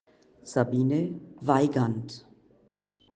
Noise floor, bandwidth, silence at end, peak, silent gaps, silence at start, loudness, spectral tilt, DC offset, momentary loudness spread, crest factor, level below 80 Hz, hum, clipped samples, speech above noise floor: -67 dBFS; 9.4 kHz; 0.95 s; -6 dBFS; none; 0.45 s; -27 LUFS; -7.5 dB/octave; under 0.1%; 13 LU; 22 dB; -66 dBFS; none; under 0.1%; 40 dB